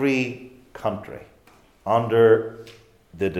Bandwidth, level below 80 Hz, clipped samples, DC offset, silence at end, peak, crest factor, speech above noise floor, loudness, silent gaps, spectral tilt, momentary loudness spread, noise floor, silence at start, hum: 12.5 kHz; -60 dBFS; under 0.1%; under 0.1%; 0 s; -6 dBFS; 18 dB; 33 dB; -21 LUFS; none; -7 dB/octave; 25 LU; -55 dBFS; 0 s; none